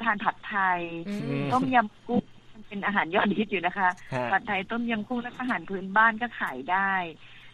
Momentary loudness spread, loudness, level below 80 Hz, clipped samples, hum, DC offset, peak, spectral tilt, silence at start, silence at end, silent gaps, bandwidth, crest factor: 9 LU; -27 LUFS; -60 dBFS; under 0.1%; none; under 0.1%; -8 dBFS; -6.5 dB/octave; 0 s; 0.05 s; none; 12.5 kHz; 20 dB